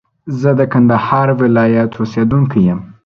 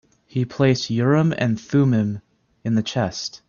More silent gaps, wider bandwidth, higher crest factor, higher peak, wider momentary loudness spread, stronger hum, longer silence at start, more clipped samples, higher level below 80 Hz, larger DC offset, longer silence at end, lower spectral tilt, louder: neither; about the same, 6.6 kHz vs 7.2 kHz; about the same, 12 dB vs 16 dB; first, 0 dBFS vs -4 dBFS; second, 5 LU vs 9 LU; neither; about the same, 0.25 s vs 0.35 s; neither; first, -44 dBFS vs -56 dBFS; neither; about the same, 0.15 s vs 0.15 s; first, -9.5 dB/octave vs -6.5 dB/octave; first, -13 LUFS vs -21 LUFS